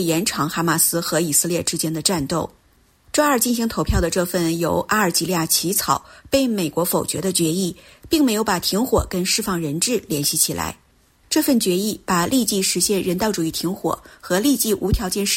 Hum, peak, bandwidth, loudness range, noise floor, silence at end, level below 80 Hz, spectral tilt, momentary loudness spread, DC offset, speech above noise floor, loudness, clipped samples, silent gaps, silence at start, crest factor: none; -4 dBFS; 16.5 kHz; 1 LU; -57 dBFS; 0 s; -38 dBFS; -3.5 dB/octave; 6 LU; under 0.1%; 37 dB; -20 LUFS; under 0.1%; none; 0 s; 16 dB